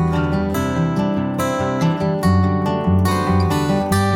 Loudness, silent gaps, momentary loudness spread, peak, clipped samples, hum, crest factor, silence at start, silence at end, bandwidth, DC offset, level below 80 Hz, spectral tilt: -18 LUFS; none; 3 LU; -6 dBFS; under 0.1%; none; 12 dB; 0 s; 0 s; 17 kHz; under 0.1%; -36 dBFS; -7 dB/octave